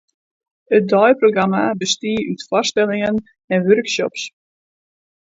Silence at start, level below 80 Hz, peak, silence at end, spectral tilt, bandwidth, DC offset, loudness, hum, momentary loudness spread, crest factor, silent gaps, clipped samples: 0.7 s; -58 dBFS; 0 dBFS; 1.05 s; -4.5 dB/octave; 7.8 kHz; under 0.1%; -17 LUFS; none; 10 LU; 18 dB; 3.44-3.48 s; under 0.1%